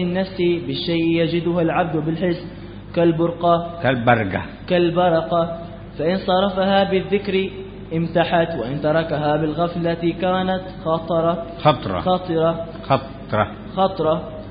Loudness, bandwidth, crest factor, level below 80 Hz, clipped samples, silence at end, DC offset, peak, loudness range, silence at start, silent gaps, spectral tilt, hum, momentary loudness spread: -20 LUFS; 5.2 kHz; 20 dB; -44 dBFS; under 0.1%; 0 s; under 0.1%; 0 dBFS; 2 LU; 0 s; none; -11.5 dB/octave; 50 Hz at -40 dBFS; 7 LU